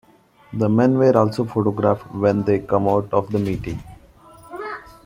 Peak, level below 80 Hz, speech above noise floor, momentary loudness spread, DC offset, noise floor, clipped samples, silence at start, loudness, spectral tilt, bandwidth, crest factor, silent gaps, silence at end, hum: -2 dBFS; -48 dBFS; 28 dB; 17 LU; under 0.1%; -47 dBFS; under 0.1%; 0.5 s; -19 LUFS; -9 dB/octave; 15 kHz; 20 dB; none; 0.25 s; none